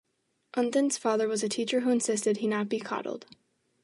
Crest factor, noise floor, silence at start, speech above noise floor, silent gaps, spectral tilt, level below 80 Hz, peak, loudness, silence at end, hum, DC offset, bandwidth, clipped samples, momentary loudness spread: 16 dB; -76 dBFS; 0.55 s; 48 dB; none; -3.5 dB/octave; -80 dBFS; -14 dBFS; -29 LUFS; 0.6 s; none; under 0.1%; 11.5 kHz; under 0.1%; 8 LU